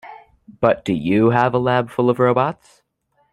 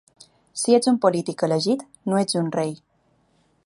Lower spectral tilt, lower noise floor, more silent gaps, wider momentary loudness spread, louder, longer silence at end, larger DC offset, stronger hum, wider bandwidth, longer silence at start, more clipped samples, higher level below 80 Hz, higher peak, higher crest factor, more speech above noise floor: first, -8 dB/octave vs -5 dB/octave; about the same, -65 dBFS vs -64 dBFS; neither; second, 5 LU vs 10 LU; first, -18 LUFS vs -22 LUFS; about the same, 0.8 s vs 0.9 s; neither; neither; about the same, 11.5 kHz vs 11.5 kHz; second, 0.05 s vs 0.55 s; neither; first, -54 dBFS vs -72 dBFS; first, 0 dBFS vs -4 dBFS; about the same, 18 dB vs 20 dB; first, 48 dB vs 43 dB